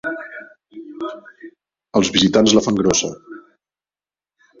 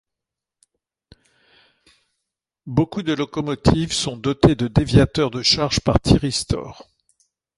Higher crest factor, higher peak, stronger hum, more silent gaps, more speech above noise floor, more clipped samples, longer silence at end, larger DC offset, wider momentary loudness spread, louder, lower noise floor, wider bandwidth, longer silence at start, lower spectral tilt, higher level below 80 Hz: about the same, 20 dB vs 20 dB; about the same, 0 dBFS vs 0 dBFS; neither; neither; first, over 74 dB vs 66 dB; neither; first, 1.2 s vs 0.85 s; neither; first, 24 LU vs 8 LU; first, -16 LUFS vs -19 LUFS; first, under -90 dBFS vs -85 dBFS; second, 7.8 kHz vs 11.5 kHz; second, 0.05 s vs 2.65 s; second, -3.5 dB/octave vs -5.5 dB/octave; second, -50 dBFS vs -36 dBFS